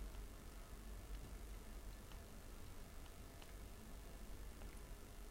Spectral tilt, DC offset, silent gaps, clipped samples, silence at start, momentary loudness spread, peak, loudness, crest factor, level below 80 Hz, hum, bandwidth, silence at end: -4.5 dB/octave; under 0.1%; none; under 0.1%; 0 s; 3 LU; -40 dBFS; -57 LUFS; 14 dB; -54 dBFS; none; 16 kHz; 0 s